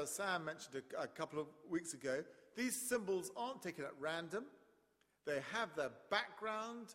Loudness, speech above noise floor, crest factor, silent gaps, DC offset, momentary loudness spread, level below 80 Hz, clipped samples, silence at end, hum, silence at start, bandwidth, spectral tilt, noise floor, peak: -43 LUFS; 34 dB; 22 dB; none; under 0.1%; 8 LU; -84 dBFS; under 0.1%; 0 s; none; 0 s; 16 kHz; -3 dB/octave; -78 dBFS; -22 dBFS